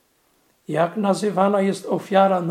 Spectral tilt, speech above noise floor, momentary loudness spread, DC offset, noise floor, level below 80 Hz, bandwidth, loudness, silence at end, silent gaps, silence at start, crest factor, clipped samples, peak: -6.5 dB/octave; 43 dB; 6 LU; under 0.1%; -63 dBFS; -76 dBFS; 14 kHz; -20 LUFS; 0 s; none; 0.7 s; 18 dB; under 0.1%; -2 dBFS